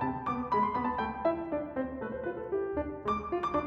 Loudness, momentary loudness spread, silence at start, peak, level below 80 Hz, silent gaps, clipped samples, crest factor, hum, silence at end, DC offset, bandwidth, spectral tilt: -33 LUFS; 7 LU; 0 s; -18 dBFS; -54 dBFS; none; under 0.1%; 14 dB; none; 0 s; under 0.1%; 7.8 kHz; -8 dB/octave